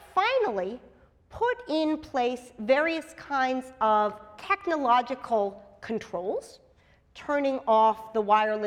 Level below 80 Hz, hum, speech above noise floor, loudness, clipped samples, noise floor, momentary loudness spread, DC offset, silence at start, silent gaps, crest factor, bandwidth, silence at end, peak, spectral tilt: -62 dBFS; none; 34 dB; -27 LUFS; under 0.1%; -61 dBFS; 12 LU; under 0.1%; 0.15 s; none; 18 dB; 13.5 kHz; 0 s; -10 dBFS; -5 dB/octave